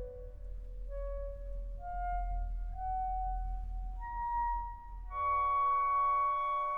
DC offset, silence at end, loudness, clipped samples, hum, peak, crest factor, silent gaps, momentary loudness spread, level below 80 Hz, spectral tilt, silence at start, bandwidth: under 0.1%; 0 s; -35 LUFS; under 0.1%; none; -24 dBFS; 10 dB; none; 17 LU; -42 dBFS; -7 dB/octave; 0 s; 3.6 kHz